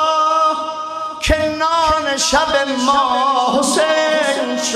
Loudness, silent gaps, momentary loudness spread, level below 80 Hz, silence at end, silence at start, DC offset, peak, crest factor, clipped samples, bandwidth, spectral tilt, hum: -15 LUFS; none; 6 LU; -34 dBFS; 0 s; 0 s; under 0.1%; -2 dBFS; 14 dB; under 0.1%; 14.5 kHz; -2.5 dB/octave; none